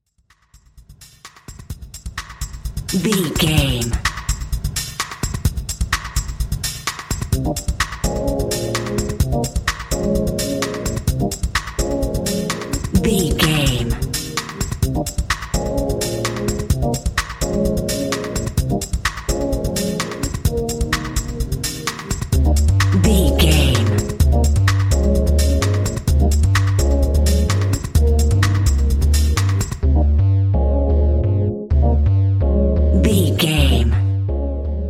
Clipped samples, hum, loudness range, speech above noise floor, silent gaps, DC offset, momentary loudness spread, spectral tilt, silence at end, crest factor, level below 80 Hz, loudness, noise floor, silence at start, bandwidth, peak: under 0.1%; none; 6 LU; 41 dB; none; under 0.1%; 8 LU; -5 dB/octave; 0 s; 16 dB; -22 dBFS; -19 LUFS; -58 dBFS; 0.75 s; 16.5 kHz; -2 dBFS